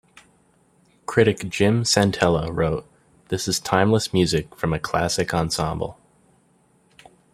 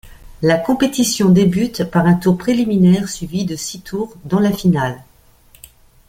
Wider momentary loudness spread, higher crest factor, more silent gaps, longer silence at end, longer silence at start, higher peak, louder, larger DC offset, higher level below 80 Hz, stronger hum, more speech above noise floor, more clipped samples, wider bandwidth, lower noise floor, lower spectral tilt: second, 9 LU vs 12 LU; first, 20 dB vs 14 dB; neither; first, 1.4 s vs 1.05 s; first, 1.1 s vs 0.05 s; about the same, -2 dBFS vs -2 dBFS; second, -22 LUFS vs -16 LUFS; neither; about the same, -46 dBFS vs -44 dBFS; neither; first, 39 dB vs 34 dB; neither; about the same, 15.5 kHz vs 16 kHz; first, -60 dBFS vs -49 dBFS; second, -4.5 dB/octave vs -6 dB/octave